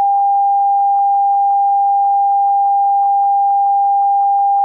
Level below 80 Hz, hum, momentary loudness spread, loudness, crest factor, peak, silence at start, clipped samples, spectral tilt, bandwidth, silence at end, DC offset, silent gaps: -86 dBFS; none; 0 LU; -13 LUFS; 4 dB; -8 dBFS; 0 s; under 0.1%; -4 dB/octave; 1.4 kHz; 0 s; under 0.1%; none